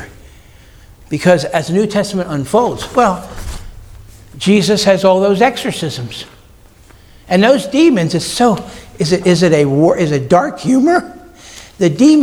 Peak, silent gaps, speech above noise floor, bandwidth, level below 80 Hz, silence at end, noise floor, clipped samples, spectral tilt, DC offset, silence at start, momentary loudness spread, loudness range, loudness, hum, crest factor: 0 dBFS; none; 30 dB; 18.5 kHz; -38 dBFS; 0 s; -42 dBFS; under 0.1%; -5.5 dB/octave; under 0.1%; 0 s; 17 LU; 3 LU; -13 LUFS; none; 14 dB